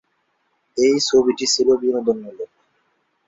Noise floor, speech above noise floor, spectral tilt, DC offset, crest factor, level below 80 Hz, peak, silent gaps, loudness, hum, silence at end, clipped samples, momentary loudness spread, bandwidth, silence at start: -68 dBFS; 50 dB; -2.5 dB/octave; under 0.1%; 16 dB; -60 dBFS; -4 dBFS; none; -18 LUFS; none; 0.8 s; under 0.1%; 18 LU; 7.8 kHz; 0.75 s